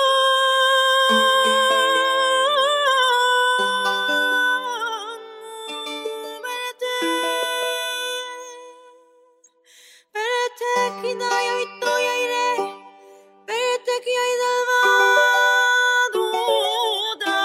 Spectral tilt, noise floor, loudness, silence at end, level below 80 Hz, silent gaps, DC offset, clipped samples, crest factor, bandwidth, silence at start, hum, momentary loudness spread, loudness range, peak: 0 dB/octave; -56 dBFS; -19 LUFS; 0 s; -78 dBFS; none; under 0.1%; under 0.1%; 16 dB; 16 kHz; 0 s; none; 14 LU; 9 LU; -4 dBFS